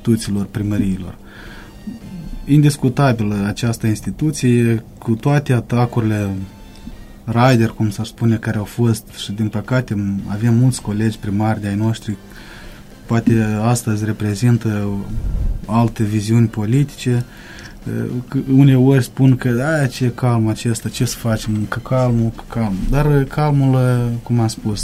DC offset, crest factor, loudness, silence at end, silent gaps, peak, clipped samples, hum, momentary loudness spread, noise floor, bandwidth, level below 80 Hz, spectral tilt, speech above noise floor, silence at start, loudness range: under 0.1%; 16 dB; -17 LUFS; 0 s; none; 0 dBFS; under 0.1%; none; 17 LU; -36 dBFS; 15 kHz; -32 dBFS; -7 dB/octave; 20 dB; 0 s; 3 LU